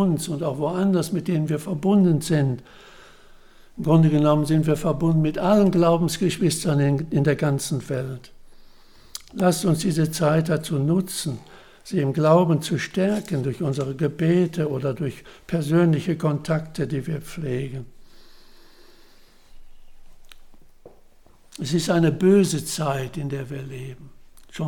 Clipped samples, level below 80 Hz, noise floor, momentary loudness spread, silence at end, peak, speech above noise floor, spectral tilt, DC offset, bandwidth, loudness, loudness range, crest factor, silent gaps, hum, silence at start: under 0.1%; -48 dBFS; -50 dBFS; 13 LU; 0 s; -4 dBFS; 29 dB; -6.5 dB/octave; under 0.1%; 18 kHz; -22 LUFS; 8 LU; 18 dB; none; none; 0 s